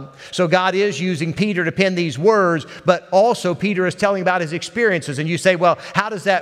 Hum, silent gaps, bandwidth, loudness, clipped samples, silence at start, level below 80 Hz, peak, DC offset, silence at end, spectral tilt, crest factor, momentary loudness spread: none; none; 13 kHz; -18 LUFS; under 0.1%; 0 s; -60 dBFS; 0 dBFS; under 0.1%; 0 s; -5.5 dB/octave; 18 dB; 6 LU